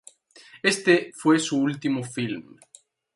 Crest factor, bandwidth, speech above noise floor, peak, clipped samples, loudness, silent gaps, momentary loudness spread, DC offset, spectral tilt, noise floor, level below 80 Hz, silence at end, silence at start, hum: 20 dB; 11.5 kHz; 28 dB; -6 dBFS; under 0.1%; -23 LUFS; none; 10 LU; under 0.1%; -4.5 dB/octave; -52 dBFS; -70 dBFS; 0.75 s; 0.55 s; none